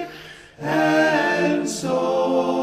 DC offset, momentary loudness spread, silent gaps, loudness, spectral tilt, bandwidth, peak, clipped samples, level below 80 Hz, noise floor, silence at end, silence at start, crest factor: under 0.1%; 16 LU; none; -20 LUFS; -4.5 dB/octave; 15.5 kHz; -6 dBFS; under 0.1%; -60 dBFS; -41 dBFS; 0 s; 0 s; 14 dB